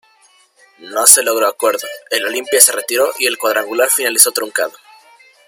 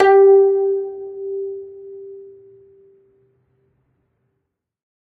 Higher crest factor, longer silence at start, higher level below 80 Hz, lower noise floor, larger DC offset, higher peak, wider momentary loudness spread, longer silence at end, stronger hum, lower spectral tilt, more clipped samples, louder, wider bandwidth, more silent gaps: about the same, 16 dB vs 18 dB; first, 0.8 s vs 0 s; about the same, -66 dBFS vs -66 dBFS; second, -52 dBFS vs -76 dBFS; neither; about the same, 0 dBFS vs -2 dBFS; second, 12 LU vs 26 LU; second, 0.75 s vs 2.8 s; neither; second, 1.5 dB/octave vs -6 dB/octave; first, 0.4% vs under 0.1%; first, -12 LUFS vs -16 LUFS; first, 17 kHz vs 4.7 kHz; neither